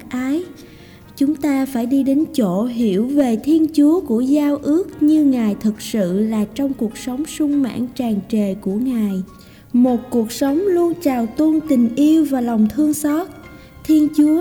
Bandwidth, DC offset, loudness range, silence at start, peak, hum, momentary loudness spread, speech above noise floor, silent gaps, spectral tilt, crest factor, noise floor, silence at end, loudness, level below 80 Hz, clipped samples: 19 kHz; under 0.1%; 4 LU; 0 s; -6 dBFS; none; 8 LU; 25 dB; none; -6.5 dB/octave; 12 dB; -41 dBFS; 0 s; -18 LUFS; -50 dBFS; under 0.1%